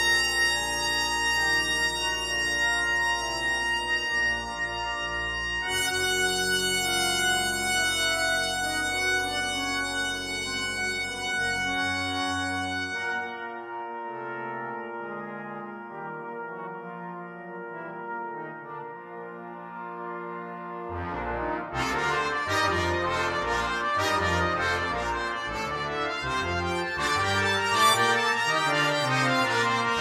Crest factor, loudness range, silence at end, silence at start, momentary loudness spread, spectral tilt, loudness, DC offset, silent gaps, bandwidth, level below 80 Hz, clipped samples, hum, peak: 20 dB; 13 LU; 0 s; 0 s; 14 LU; -2.5 dB/octave; -26 LUFS; under 0.1%; none; 16 kHz; -50 dBFS; under 0.1%; none; -8 dBFS